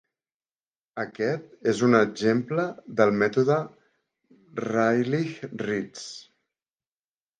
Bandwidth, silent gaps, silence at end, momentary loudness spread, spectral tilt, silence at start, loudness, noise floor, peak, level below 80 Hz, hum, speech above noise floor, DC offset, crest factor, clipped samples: 9.4 kHz; none; 1.2 s; 17 LU; -6 dB/octave; 0.95 s; -25 LUFS; under -90 dBFS; -4 dBFS; -70 dBFS; none; over 65 dB; under 0.1%; 22 dB; under 0.1%